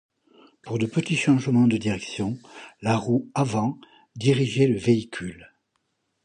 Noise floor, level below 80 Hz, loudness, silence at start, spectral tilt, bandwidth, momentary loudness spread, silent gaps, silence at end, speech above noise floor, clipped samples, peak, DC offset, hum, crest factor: -74 dBFS; -58 dBFS; -24 LUFS; 0.65 s; -6.5 dB/octave; 11 kHz; 14 LU; none; 0.8 s; 51 dB; under 0.1%; -6 dBFS; under 0.1%; none; 18 dB